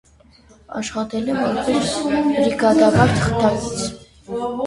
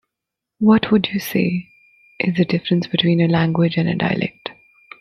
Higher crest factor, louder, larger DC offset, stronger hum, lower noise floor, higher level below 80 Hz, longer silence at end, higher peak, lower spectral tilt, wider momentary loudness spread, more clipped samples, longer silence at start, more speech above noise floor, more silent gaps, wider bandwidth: about the same, 18 dB vs 16 dB; about the same, -19 LUFS vs -18 LUFS; neither; neither; second, -50 dBFS vs -83 dBFS; first, -42 dBFS vs -56 dBFS; second, 0 s vs 0.5 s; about the same, 0 dBFS vs -2 dBFS; second, -5.5 dB/octave vs -7 dB/octave; first, 13 LU vs 9 LU; neither; about the same, 0.7 s vs 0.6 s; second, 32 dB vs 66 dB; neither; second, 11.5 kHz vs 15.5 kHz